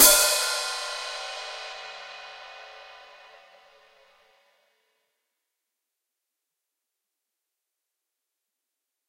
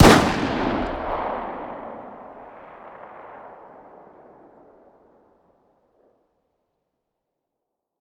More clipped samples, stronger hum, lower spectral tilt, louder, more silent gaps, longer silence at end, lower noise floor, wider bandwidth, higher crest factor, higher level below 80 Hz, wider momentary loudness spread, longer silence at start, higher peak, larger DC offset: neither; neither; second, 2.5 dB/octave vs -5 dB/octave; about the same, -24 LUFS vs -23 LUFS; neither; first, 6.15 s vs 4.45 s; about the same, -85 dBFS vs -82 dBFS; second, 16 kHz vs over 20 kHz; first, 30 dB vs 24 dB; second, -58 dBFS vs -38 dBFS; about the same, 25 LU vs 23 LU; about the same, 0 s vs 0 s; about the same, 0 dBFS vs 0 dBFS; neither